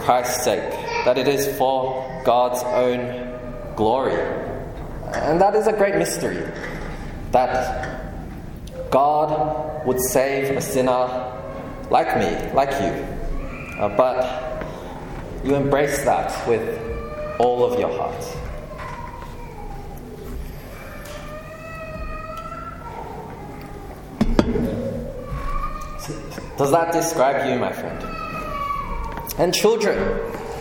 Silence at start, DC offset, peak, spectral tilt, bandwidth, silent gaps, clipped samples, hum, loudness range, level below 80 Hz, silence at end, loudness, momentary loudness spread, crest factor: 0 s; under 0.1%; 0 dBFS; -5 dB/octave; 17.5 kHz; none; under 0.1%; none; 12 LU; -36 dBFS; 0 s; -22 LUFS; 16 LU; 22 dB